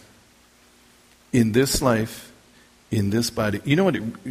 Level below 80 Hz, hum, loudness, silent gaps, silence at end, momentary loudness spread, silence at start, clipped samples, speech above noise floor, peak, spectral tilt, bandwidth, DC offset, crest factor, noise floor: -44 dBFS; none; -22 LUFS; none; 0 s; 9 LU; 1.35 s; under 0.1%; 34 dB; -6 dBFS; -5 dB/octave; 15.5 kHz; under 0.1%; 18 dB; -55 dBFS